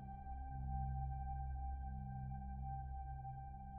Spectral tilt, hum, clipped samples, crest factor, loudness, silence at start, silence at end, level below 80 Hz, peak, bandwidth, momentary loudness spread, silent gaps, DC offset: -7 dB/octave; none; under 0.1%; 12 dB; -48 LUFS; 0 s; 0 s; -48 dBFS; -34 dBFS; 2.5 kHz; 6 LU; none; under 0.1%